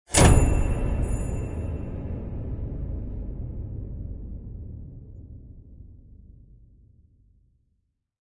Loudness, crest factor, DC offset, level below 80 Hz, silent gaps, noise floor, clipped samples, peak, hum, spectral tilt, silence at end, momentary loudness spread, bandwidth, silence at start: -27 LUFS; 24 dB; under 0.1%; -30 dBFS; none; -74 dBFS; under 0.1%; -4 dBFS; none; -5 dB/octave; 2.05 s; 25 LU; 11.5 kHz; 0.1 s